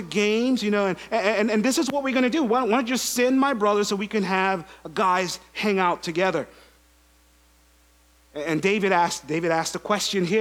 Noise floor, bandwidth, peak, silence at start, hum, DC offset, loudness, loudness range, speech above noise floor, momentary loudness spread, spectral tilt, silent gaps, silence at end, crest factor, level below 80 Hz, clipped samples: -58 dBFS; 17.5 kHz; -4 dBFS; 0 s; none; under 0.1%; -23 LUFS; 5 LU; 35 dB; 6 LU; -4 dB/octave; none; 0 s; 20 dB; -60 dBFS; under 0.1%